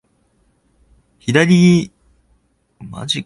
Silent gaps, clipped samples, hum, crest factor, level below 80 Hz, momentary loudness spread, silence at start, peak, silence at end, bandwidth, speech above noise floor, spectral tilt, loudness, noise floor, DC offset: none; under 0.1%; none; 18 dB; -52 dBFS; 21 LU; 1.25 s; 0 dBFS; 0.05 s; 11.5 kHz; 46 dB; -6 dB/octave; -14 LUFS; -60 dBFS; under 0.1%